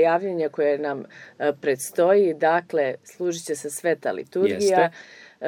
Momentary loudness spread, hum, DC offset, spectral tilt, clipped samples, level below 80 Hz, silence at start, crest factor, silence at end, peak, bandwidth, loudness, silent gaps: 10 LU; none; under 0.1%; -4.5 dB/octave; under 0.1%; -76 dBFS; 0 s; 18 dB; 0 s; -6 dBFS; 18 kHz; -23 LUFS; none